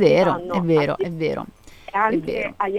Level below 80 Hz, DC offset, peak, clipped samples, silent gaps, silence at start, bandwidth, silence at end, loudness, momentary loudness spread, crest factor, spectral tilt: -50 dBFS; under 0.1%; -2 dBFS; under 0.1%; none; 0 s; 13.5 kHz; 0 s; -21 LUFS; 9 LU; 18 dB; -7 dB/octave